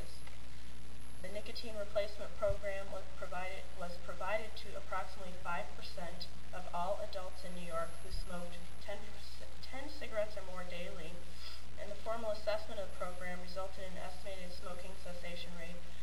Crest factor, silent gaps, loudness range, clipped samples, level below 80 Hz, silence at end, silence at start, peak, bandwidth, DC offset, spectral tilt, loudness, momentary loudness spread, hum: 20 dB; none; 4 LU; under 0.1%; -52 dBFS; 0 s; 0 s; -22 dBFS; 16 kHz; 3%; -4.5 dB/octave; -44 LUFS; 11 LU; none